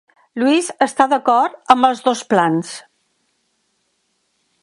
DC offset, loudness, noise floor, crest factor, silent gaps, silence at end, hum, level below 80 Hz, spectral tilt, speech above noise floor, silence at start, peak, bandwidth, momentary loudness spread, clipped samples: under 0.1%; -16 LUFS; -67 dBFS; 18 dB; none; 1.85 s; none; -64 dBFS; -4.5 dB/octave; 51 dB; 0.35 s; 0 dBFS; 11.5 kHz; 11 LU; under 0.1%